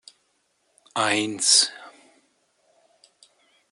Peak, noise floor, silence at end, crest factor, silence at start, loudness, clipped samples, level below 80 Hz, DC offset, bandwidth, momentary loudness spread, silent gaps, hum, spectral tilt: -4 dBFS; -70 dBFS; 1.8 s; 24 dB; 0.95 s; -20 LUFS; under 0.1%; -80 dBFS; under 0.1%; 11.5 kHz; 16 LU; none; none; -0.5 dB/octave